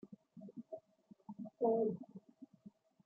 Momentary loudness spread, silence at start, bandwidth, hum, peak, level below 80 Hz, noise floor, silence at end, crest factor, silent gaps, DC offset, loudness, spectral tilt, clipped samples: 25 LU; 0.05 s; 1.4 kHz; none; -22 dBFS; -90 dBFS; -67 dBFS; 0.35 s; 20 dB; none; under 0.1%; -40 LUFS; -11.5 dB/octave; under 0.1%